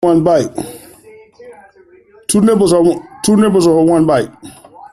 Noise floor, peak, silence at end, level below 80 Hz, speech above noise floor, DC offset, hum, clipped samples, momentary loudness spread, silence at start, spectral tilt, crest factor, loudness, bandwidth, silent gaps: -45 dBFS; -2 dBFS; 0.05 s; -46 dBFS; 34 dB; under 0.1%; none; under 0.1%; 15 LU; 0 s; -6 dB/octave; 12 dB; -12 LUFS; 14.5 kHz; none